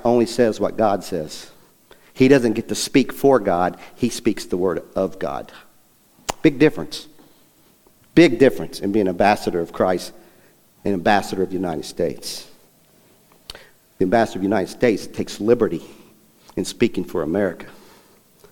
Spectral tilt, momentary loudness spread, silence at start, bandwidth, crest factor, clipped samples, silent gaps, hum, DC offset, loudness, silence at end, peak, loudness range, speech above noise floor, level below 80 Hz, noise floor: -5.5 dB/octave; 16 LU; 0 s; 18.5 kHz; 20 dB; under 0.1%; none; none; under 0.1%; -20 LUFS; 0.75 s; 0 dBFS; 6 LU; 36 dB; -48 dBFS; -55 dBFS